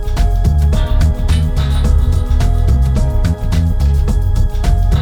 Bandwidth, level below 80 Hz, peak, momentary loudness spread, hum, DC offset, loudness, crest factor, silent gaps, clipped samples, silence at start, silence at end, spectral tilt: 13.5 kHz; -12 dBFS; -2 dBFS; 2 LU; none; under 0.1%; -15 LUFS; 10 dB; none; under 0.1%; 0 s; 0 s; -7 dB/octave